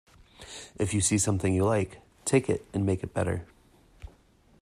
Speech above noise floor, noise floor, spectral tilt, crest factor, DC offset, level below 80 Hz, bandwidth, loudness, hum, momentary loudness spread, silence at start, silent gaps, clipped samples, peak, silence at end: 34 dB; -60 dBFS; -5 dB/octave; 18 dB; under 0.1%; -54 dBFS; 14.5 kHz; -28 LUFS; none; 12 LU; 0.4 s; none; under 0.1%; -10 dBFS; 0.55 s